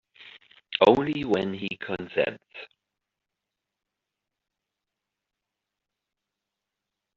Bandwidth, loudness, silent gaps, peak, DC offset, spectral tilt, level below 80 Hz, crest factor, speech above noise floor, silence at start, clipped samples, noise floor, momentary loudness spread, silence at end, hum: 7.4 kHz; -25 LUFS; none; -4 dBFS; under 0.1%; -3.5 dB/octave; -64 dBFS; 28 dB; 61 dB; 0.2 s; under 0.1%; -86 dBFS; 22 LU; 4.5 s; none